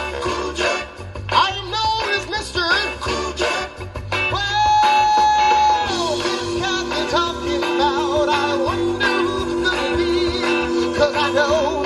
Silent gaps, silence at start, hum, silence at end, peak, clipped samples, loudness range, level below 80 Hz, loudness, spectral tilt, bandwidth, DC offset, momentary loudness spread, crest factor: none; 0 s; none; 0 s; -2 dBFS; under 0.1%; 3 LU; -38 dBFS; -18 LUFS; -3.5 dB/octave; 11.5 kHz; under 0.1%; 8 LU; 18 dB